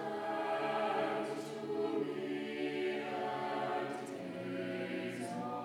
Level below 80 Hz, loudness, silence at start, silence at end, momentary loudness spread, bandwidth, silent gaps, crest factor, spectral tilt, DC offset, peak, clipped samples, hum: under -90 dBFS; -38 LUFS; 0 s; 0 s; 6 LU; 17.5 kHz; none; 14 dB; -5.5 dB/octave; under 0.1%; -24 dBFS; under 0.1%; none